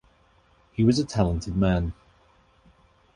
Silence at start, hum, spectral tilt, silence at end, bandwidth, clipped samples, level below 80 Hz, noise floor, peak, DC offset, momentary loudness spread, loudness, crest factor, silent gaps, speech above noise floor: 0.8 s; none; -7 dB/octave; 1.25 s; 11 kHz; under 0.1%; -40 dBFS; -61 dBFS; -6 dBFS; under 0.1%; 9 LU; -24 LUFS; 20 dB; none; 38 dB